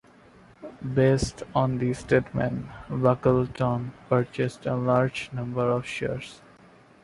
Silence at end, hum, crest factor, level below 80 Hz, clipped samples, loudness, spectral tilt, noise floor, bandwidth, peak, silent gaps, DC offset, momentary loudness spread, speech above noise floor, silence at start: 0.65 s; none; 20 dB; -50 dBFS; under 0.1%; -26 LUFS; -7 dB/octave; -54 dBFS; 11.5 kHz; -6 dBFS; none; under 0.1%; 12 LU; 28 dB; 0.6 s